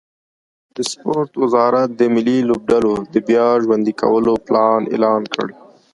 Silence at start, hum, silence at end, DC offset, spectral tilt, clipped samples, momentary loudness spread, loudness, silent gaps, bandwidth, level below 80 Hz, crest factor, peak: 0.75 s; none; 0.4 s; under 0.1%; -5.5 dB/octave; under 0.1%; 9 LU; -16 LUFS; none; 11.5 kHz; -54 dBFS; 16 dB; 0 dBFS